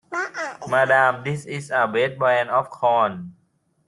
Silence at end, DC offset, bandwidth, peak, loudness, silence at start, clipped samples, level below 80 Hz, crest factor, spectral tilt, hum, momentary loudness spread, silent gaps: 0.55 s; under 0.1%; 11.5 kHz; -4 dBFS; -21 LUFS; 0.1 s; under 0.1%; -66 dBFS; 18 dB; -5 dB/octave; none; 12 LU; none